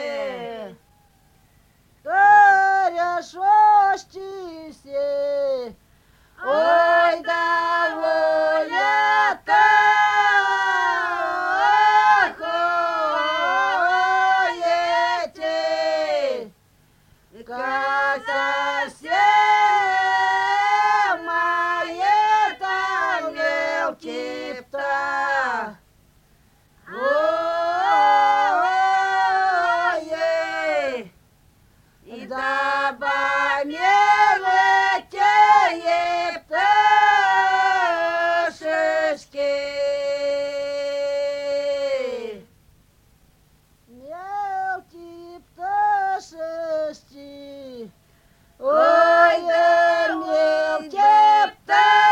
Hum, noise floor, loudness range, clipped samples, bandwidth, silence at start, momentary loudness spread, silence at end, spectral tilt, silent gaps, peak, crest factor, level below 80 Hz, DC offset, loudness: none; -58 dBFS; 9 LU; under 0.1%; 9.6 kHz; 0 s; 14 LU; 0 s; -2 dB/octave; none; -4 dBFS; 16 dB; -62 dBFS; under 0.1%; -19 LUFS